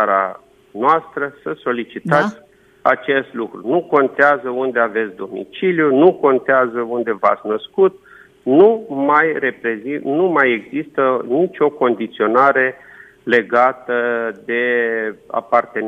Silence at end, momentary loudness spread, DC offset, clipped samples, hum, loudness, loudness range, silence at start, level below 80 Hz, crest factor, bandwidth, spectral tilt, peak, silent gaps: 0 s; 11 LU; under 0.1%; under 0.1%; none; -17 LUFS; 3 LU; 0 s; -66 dBFS; 16 dB; 7 kHz; -7.5 dB/octave; 0 dBFS; none